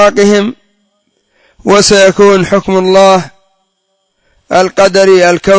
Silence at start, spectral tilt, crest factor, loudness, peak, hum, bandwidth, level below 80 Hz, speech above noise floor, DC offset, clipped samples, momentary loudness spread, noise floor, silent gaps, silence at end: 0 s; -4 dB/octave; 8 dB; -7 LUFS; 0 dBFS; none; 8 kHz; -40 dBFS; 56 dB; under 0.1%; 2%; 7 LU; -62 dBFS; none; 0 s